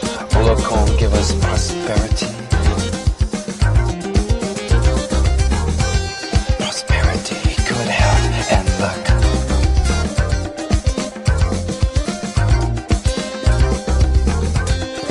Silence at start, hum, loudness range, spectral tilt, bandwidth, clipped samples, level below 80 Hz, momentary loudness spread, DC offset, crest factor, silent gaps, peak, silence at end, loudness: 0 s; none; 2 LU; -5 dB/octave; 11.5 kHz; under 0.1%; -18 dBFS; 5 LU; under 0.1%; 14 dB; none; -2 dBFS; 0 s; -18 LUFS